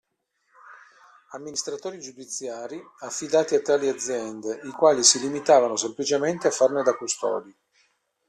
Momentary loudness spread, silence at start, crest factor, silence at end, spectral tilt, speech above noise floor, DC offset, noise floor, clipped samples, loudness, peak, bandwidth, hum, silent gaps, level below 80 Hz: 17 LU; 0.65 s; 24 dB; 0.8 s; -2 dB/octave; 49 dB; under 0.1%; -73 dBFS; under 0.1%; -23 LUFS; -2 dBFS; 13 kHz; none; none; -74 dBFS